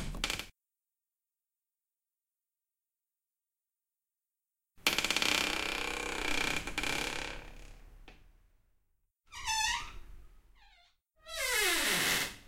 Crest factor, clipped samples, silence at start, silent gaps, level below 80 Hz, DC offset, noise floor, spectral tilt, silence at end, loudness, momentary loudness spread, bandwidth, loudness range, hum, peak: 28 dB; under 0.1%; 0 s; none; -52 dBFS; under 0.1%; under -90 dBFS; -1 dB/octave; 0 s; -32 LUFS; 15 LU; 16.5 kHz; 7 LU; none; -8 dBFS